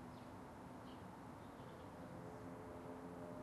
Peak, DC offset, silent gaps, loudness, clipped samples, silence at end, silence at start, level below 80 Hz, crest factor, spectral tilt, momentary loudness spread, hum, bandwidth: -40 dBFS; under 0.1%; none; -55 LUFS; under 0.1%; 0 s; 0 s; -70 dBFS; 14 dB; -6.5 dB/octave; 3 LU; none; 12.5 kHz